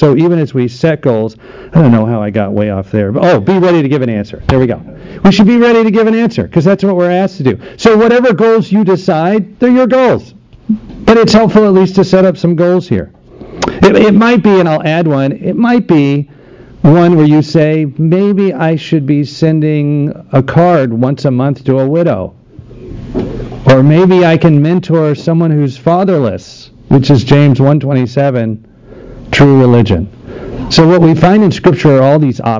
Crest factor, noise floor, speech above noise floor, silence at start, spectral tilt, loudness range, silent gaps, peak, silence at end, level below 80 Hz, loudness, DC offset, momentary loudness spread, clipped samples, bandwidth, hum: 8 dB; -32 dBFS; 24 dB; 0 s; -8 dB/octave; 2 LU; none; 0 dBFS; 0 s; -34 dBFS; -9 LUFS; under 0.1%; 10 LU; 0.9%; 7.6 kHz; none